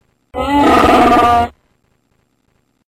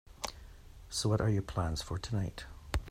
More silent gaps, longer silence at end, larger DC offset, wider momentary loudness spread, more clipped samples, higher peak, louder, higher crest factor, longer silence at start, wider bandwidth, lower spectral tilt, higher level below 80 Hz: neither; first, 1.4 s vs 0 s; neither; about the same, 13 LU vs 15 LU; neither; first, -2 dBFS vs -16 dBFS; first, -11 LUFS vs -36 LUFS; second, 12 dB vs 18 dB; first, 0.35 s vs 0.1 s; about the same, 16 kHz vs 15.5 kHz; about the same, -5.5 dB/octave vs -5 dB/octave; first, -34 dBFS vs -46 dBFS